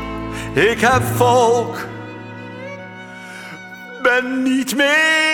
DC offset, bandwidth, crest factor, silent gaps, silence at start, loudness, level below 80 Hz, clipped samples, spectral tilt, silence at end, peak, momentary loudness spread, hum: under 0.1%; 19.5 kHz; 16 dB; none; 0 s; -16 LUFS; -44 dBFS; under 0.1%; -4 dB/octave; 0 s; -2 dBFS; 20 LU; none